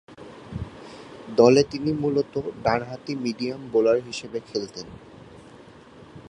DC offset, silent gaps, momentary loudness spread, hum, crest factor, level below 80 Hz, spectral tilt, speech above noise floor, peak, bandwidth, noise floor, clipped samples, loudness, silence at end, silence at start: under 0.1%; none; 24 LU; none; 22 dB; -52 dBFS; -6 dB/octave; 24 dB; -2 dBFS; 10.5 kHz; -47 dBFS; under 0.1%; -24 LUFS; 0 s; 0.1 s